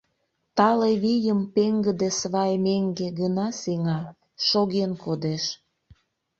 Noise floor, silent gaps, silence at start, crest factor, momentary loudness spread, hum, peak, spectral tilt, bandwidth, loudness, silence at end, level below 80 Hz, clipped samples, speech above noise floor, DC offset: -74 dBFS; none; 0.55 s; 20 dB; 7 LU; none; -4 dBFS; -5.5 dB/octave; 7.8 kHz; -24 LUFS; 0.85 s; -64 dBFS; under 0.1%; 51 dB; under 0.1%